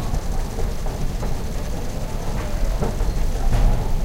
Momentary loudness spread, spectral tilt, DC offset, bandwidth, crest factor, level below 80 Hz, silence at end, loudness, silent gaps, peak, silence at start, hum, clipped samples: 7 LU; -6 dB/octave; under 0.1%; 16 kHz; 14 dB; -22 dBFS; 0 s; -26 LUFS; none; -6 dBFS; 0 s; none; under 0.1%